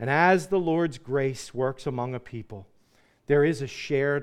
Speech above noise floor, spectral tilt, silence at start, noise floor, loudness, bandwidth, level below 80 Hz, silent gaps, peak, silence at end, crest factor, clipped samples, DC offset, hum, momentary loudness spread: 37 dB; -6.5 dB/octave; 0 s; -63 dBFS; -26 LUFS; 13 kHz; -58 dBFS; none; -6 dBFS; 0 s; 20 dB; under 0.1%; under 0.1%; none; 18 LU